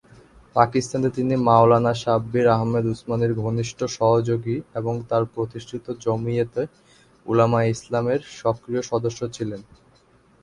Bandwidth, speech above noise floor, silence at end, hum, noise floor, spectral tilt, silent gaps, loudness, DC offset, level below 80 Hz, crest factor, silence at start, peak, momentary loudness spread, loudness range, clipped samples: 11 kHz; 35 dB; 0.8 s; none; -57 dBFS; -7 dB/octave; none; -22 LUFS; under 0.1%; -54 dBFS; 22 dB; 0.55 s; 0 dBFS; 11 LU; 4 LU; under 0.1%